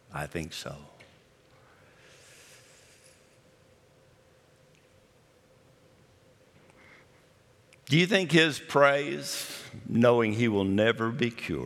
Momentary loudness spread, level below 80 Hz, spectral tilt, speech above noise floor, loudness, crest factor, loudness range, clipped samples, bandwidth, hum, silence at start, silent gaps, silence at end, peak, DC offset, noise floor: 16 LU; -66 dBFS; -5 dB/octave; 35 dB; -26 LUFS; 24 dB; 18 LU; under 0.1%; 16.5 kHz; none; 0.1 s; none; 0 s; -6 dBFS; under 0.1%; -61 dBFS